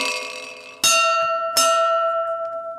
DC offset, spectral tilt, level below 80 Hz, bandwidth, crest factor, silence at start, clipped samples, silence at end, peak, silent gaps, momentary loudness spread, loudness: under 0.1%; 1.5 dB/octave; -72 dBFS; 16 kHz; 16 dB; 0 s; under 0.1%; 0 s; -4 dBFS; none; 14 LU; -18 LUFS